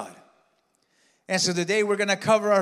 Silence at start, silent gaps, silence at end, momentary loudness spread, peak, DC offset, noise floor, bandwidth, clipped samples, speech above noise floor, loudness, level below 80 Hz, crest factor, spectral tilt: 0 s; none; 0 s; 6 LU; -8 dBFS; under 0.1%; -69 dBFS; 14.5 kHz; under 0.1%; 46 dB; -23 LUFS; -76 dBFS; 18 dB; -3.5 dB/octave